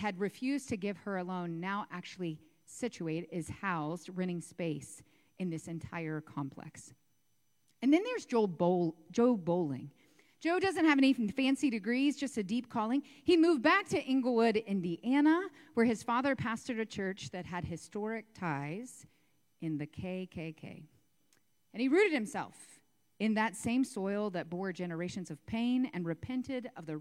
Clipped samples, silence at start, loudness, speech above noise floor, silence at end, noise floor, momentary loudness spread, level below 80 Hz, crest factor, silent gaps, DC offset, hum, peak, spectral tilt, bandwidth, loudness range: under 0.1%; 0 s; -34 LUFS; 45 dB; 0 s; -79 dBFS; 14 LU; -70 dBFS; 18 dB; none; under 0.1%; none; -16 dBFS; -5.5 dB/octave; 13 kHz; 11 LU